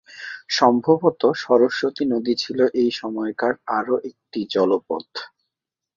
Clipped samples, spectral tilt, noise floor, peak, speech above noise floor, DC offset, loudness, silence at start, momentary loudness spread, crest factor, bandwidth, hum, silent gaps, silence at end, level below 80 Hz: under 0.1%; -5 dB/octave; -85 dBFS; -2 dBFS; 64 dB; under 0.1%; -21 LUFS; 0.1 s; 14 LU; 20 dB; 7.4 kHz; none; none; 0.7 s; -66 dBFS